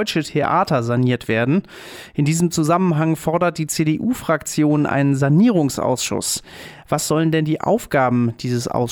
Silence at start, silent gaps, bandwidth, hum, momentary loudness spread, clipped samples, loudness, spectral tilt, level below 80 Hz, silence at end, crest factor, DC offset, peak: 0 s; none; 18.5 kHz; none; 6 LU; under 0.1%; -19 LUFS; -5.5 dB/octave; -50 dBFS; 0 s; 12 dB; under 0.1%; -6 dBFS